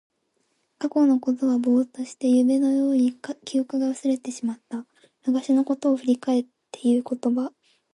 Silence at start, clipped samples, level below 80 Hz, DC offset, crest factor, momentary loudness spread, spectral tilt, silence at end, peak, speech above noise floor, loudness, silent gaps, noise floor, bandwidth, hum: 0.8 s; under 0.1%; -76 dBFS; under 0.1%; 14 dB; 11 LU; -5 dB/octave; 0.45 s; -10 dBFS; 49 dB; -23 LUFS; none; -72 dBFS; 11 kHz; none